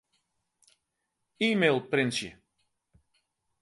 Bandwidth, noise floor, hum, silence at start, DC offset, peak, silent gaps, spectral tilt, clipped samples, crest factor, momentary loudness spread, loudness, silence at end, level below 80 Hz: 11.5 kHz; -82 dBFS; none; 1.4 s; under 0.1%; -10 dBFS; none; -4.5 dB/octave; under 0.1%; 24 dB; 10 LU; -27 LUFS; 1.3 s; -72 dBFS